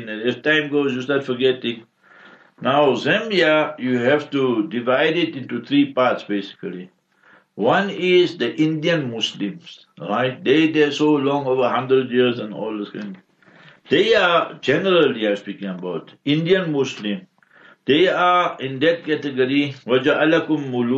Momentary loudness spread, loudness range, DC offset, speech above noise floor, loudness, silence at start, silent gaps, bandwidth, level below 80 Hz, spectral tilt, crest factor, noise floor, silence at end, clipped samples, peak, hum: 12 LU; 2 LU; under 0.1%; 35 dB; -19 LUFS; 0 s; none; 7.8 kHz; -66 dBFS; -6 dB/octave; 14 dB; -54 dBFS; 0 s; under 0.1%; -6 dBFS; none